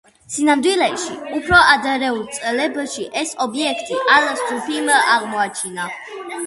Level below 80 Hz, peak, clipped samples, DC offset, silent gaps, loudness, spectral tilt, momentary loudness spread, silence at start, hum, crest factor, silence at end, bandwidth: -48 dBFS; 0 dBFS; under 0.1%; under 0.1%; none; -17 LUFS; -2 dB/octave; 12 LU; 0.3 s; none; 18 dB; 0 s; 12 kHz